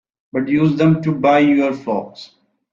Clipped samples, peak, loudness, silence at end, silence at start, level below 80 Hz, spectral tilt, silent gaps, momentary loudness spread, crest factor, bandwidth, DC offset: under 0.1%; -2 dBFS; -16 LUFS; 0.45 s; 0.35 s; -58 dBFS; -8.5 dB/octave; none; 11 LU; 14 dB; 7.2 kHz; under 0.1%